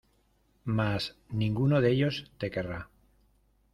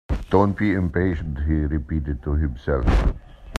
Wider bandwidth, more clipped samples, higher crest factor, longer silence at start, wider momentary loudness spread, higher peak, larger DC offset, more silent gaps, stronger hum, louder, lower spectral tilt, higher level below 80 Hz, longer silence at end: first, 12.5 kHz vs 9 kHz; neither; about the same, 18 dB vs 20 dB; first, 0.65 s vs 0.1 s; first, 15 LU vs 7 LU; second, -14 dBFS vs -2 dBFS; neither; neither; neither; second, -30 LUFS vs -23 LUFS; about the same, -7.5 dB/octave vs -8.5 dB/octave; second, -56 dBFS vs -26 dBFS; first, 0.9 s vs 0 s